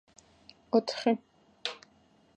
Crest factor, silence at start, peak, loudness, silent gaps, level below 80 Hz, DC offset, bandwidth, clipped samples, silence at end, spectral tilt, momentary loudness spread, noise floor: 22 dB; 0.75 s; -12 dBFS; -31 LUFS; none; -76 dBFS; under 0.1%; 9.2 kHz; under 0.1%; 0.6 s; -4.5 dB/octave; 11 LU; -64 dBFS